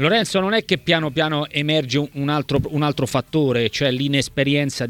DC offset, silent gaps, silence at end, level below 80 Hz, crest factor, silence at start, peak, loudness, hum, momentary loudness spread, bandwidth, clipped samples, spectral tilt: under 0.1%; none; 0 s; -48 dBFS; 18 dB; 0 s; -2 dBFS; -20 LUFS; none; 4 LU; 17 kHz; under 0.1%; -5 dB/octave